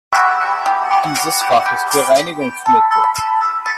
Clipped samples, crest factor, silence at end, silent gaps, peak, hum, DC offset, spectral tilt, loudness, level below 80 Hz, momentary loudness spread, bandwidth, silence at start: under 0.1%; 14 dB; 0 s; none; -2 dBFS; none; under 0.1%; -2 dB/octave; -15 LUFS; -56 dBFS; 4 LU; 14.5 kHz; 0.1 s